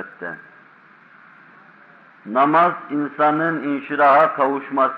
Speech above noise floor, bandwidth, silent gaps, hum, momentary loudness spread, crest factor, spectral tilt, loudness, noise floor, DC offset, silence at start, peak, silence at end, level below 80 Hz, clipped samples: 31 dB; 5.4 kHz; none; none; 17 LU; 16 dB; -8 dB/octave; -18 LUFS; -49 dBFS; under 0.1%; 0 s; -4 dBFS; 0 s; -78 dBFS; under 0.1%